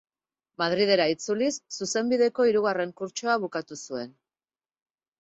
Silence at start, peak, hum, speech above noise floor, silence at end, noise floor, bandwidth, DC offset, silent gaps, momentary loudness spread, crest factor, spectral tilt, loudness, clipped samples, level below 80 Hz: 0.6 s; -8 dBFS; none; over 64 dB; 1.1 s; under -90 dBFS; 8.2 kHz; under 0.1%; none; 13 LU; 18 dB; -3.5 dB/octave; -26 LUFS; under 0.1%; -72 dBFS